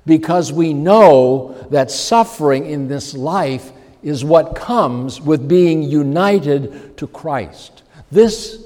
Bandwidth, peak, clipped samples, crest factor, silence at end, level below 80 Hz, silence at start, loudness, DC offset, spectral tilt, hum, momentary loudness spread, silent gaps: 16.5 kHz; 0 dBFS; 0.1%; 14 dB; 0.05 s; -46 dBFS; 0.05 s; -14 LUFS; under 0.1%; -6 dB/octave; none; 12 LU; none